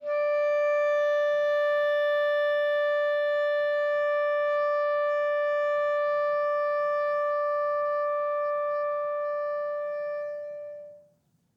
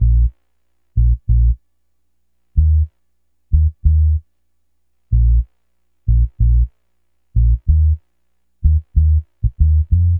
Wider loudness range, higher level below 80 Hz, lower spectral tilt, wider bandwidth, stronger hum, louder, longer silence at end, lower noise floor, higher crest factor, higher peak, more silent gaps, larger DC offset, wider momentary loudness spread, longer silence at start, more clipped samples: about the same, 4 LU vs 2 LU; second, -86 dBFS vs -16 dBFS; second, -2 dB/octave vs -13.5 dB/octave; first, 6.8 kHz vs 0.4 kHz; second, none vs 60 Hz at -30 dBFS; second, -26 LUFS vs -17 LUFS; first, 0.6 s vs 0 s; second, -67 dBFS vs -71 dBFS; second, 8 dB vs 14 dB; second, -18 dBFS vs -2 dBFS; neither; neither; about the same, 7 LU vs 9 LU; about the same, 0 s vs 0 s; neither